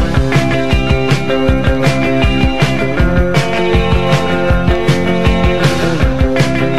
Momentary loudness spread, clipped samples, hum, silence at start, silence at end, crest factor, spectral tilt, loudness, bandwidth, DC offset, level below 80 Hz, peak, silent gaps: 1 LU; under 0.1%; none; 0 s; 0 s; 12 dB; -6.5 dB/octave; -13 LUFS; 13.5 kHz; 9%; -18 dBFS; 0 dBFS; none